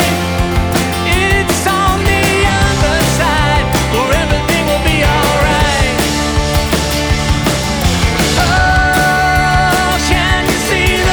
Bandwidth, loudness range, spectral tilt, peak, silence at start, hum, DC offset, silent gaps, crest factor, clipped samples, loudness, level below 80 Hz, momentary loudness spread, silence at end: over 20 kHz; 1 LU; -4 dB/octave; 0 dBFS; 0 s; none; under 0.1%; none; 12 dB; under 0.1%; -12 LUFS; -20 dBFS; 3 LU; 0 s